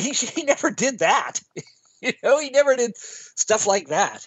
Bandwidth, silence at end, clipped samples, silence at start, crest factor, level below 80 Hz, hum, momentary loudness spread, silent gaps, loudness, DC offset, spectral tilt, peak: 8.4 kHz; 0 s; under 0.1%; 0 s; 18 dB; -74 dBFS; none; 13 LU; none; -21 LUFS; under 0.1%; -2 dB/octave; -4 dBFS